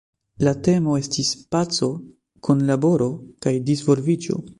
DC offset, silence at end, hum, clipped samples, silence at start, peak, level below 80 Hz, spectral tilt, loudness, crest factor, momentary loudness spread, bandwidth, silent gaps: under 0.1%; 0.05 s; none; under 0.1%; 0.4 s; -4 dBFS; -54 dBFS; -6 dB/octave; -21 LUFS; 18 dB; 7 LU; 11.5 kHz; none